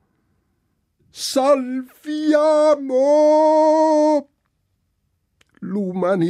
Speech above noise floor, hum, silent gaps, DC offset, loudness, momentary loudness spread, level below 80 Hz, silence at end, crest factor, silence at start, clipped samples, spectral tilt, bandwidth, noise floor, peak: 53 dB; none; none; under 0.1%; -17 LUFS; 14 LU; -70 dBFS; 0 s; 14 dB; 1.15 s; under 0.1%; -5.5 dB/octave; 14 kHz; -69 dBFS; -6 dBFS